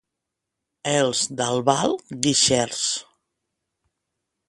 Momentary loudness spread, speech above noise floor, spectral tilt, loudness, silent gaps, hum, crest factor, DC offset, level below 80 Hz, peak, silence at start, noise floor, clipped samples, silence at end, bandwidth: 7 LU; 61 dB; -3 dB/octave; -21 LUFS; none; none; 24 dB; under 0.1%; -58 dBFS; -2 dBFS; 0.85 s; -83 dBFS; under 0.1%; 1.45 s; 11.5 kHz